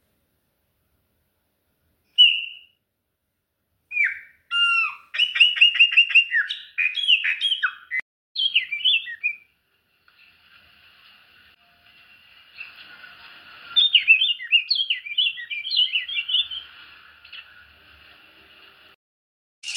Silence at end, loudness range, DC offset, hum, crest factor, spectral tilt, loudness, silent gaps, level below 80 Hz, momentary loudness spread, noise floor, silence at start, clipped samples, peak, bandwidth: 0 s; 10 LU; under 0.1%; none; 20 dB; 3.5 dB/octave; -18 LUFS; 8.02-8.35 s, 18.95-19.62 s; -74 dBFS; 22 LU; -77 dBFS; 2.2 s; under 0.1%; -4 dBFS; 11 kHz